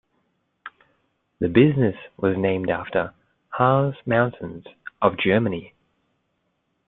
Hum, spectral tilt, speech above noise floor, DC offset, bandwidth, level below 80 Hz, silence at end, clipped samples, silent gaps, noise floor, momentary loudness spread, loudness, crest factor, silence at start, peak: none; -11.5 dB/octave; 51 dB; under 0.1%; 4.1 kHz; -58 dBFS; 1.2 s; under 0.1%; none; -72 dBFS; 22 LU; -22 LUFS; 22 dB; 0.65 s; -2 dBFS